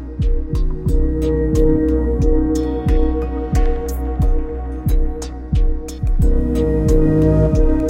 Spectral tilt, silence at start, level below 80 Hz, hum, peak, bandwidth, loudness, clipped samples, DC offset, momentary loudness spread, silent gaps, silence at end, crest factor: -8.5 dB/octave; 0 s; -18 dBFS; none; -2 dBFS; 14 kHz; -18 LUFS; under 0.1%; under 0.1%; 8 LU; none; 0 s; 14 dB